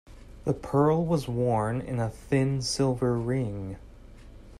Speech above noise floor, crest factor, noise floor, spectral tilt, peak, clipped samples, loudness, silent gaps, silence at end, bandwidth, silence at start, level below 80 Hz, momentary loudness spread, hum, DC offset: 21 dB; 16 dB; -47 dBFS; -6.5 dB/octave; -12 dBFS; under 0.1%; -27 LUFS; none; 0 s; 13 kHz; 0.1 s; -48 dBFS; 11 LU; none; under 0.1%